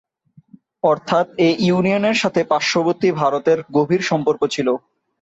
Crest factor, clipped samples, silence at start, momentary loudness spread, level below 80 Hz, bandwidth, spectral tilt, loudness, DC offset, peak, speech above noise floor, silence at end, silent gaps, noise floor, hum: 14 dB; under 0.1%; 0.85 s; 3 LU; -60 dBFS; 8 kHz; -5.5 dB/octave; -18 LUFS; under 0.1%; -4 dBFS; 35 dB; 0.45 s; none; -52 dBFS; none